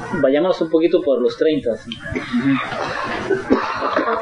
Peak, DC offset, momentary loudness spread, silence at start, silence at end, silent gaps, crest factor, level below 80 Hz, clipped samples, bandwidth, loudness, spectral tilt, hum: -2 dBFS; under 0.1%; 7 LU; 0 s; 0 s; none; 16 dB; -48 dBFS; under 0.1%; 10.5 kHz; -19 LUFS; -6 dB/octave; none